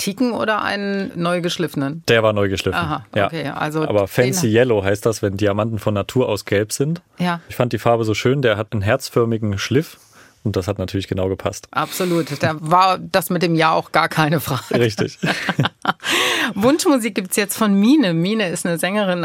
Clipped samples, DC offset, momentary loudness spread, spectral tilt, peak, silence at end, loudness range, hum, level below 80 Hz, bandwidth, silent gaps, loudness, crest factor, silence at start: under 0.1%; under 0.1%; 7 LU; -5 dB/octave; -2 dBFS; 0 s; 3 LU; none; -56 dBFS; 17 kHz; none; -19 LUFS; 18 dB; 0 s